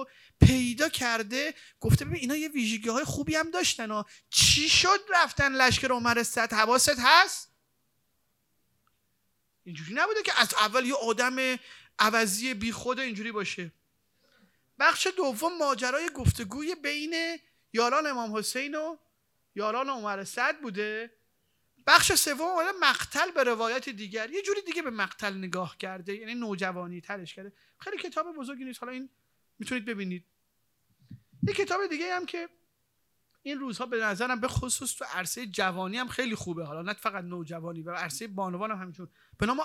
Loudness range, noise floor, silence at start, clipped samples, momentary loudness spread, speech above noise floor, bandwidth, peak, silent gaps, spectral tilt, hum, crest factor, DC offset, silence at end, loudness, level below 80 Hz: 12 LU; -76 dBFS; 0 s; under 0.1%; 17 LU; 48 dB; 18 kHz; -2 dBFS; none; -3 dB/octave; none; 28 dB; under 0.1%; 0 s; -27 LUFS; -50 dBFS